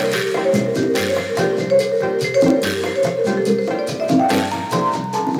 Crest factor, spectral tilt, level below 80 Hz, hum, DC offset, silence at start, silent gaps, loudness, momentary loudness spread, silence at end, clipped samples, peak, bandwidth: 14 dB; -5 dB/octave; -58 dBFS; none; under 0.1%; 0 s; none; -18 LUFS; 4 LU; 0 s; under 0.1%; -4 dBFS; 16.5 kHz